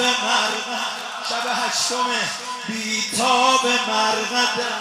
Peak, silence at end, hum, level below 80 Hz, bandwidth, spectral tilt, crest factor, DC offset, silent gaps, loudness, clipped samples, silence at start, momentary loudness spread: -4 dBFS; 0 s; none; -78 dBFS; 16 kHz; -0.5 dB/octave; 18 dB; under 0.1%; none; -20 LUFS; under 0.1%; 0 s; 9 LU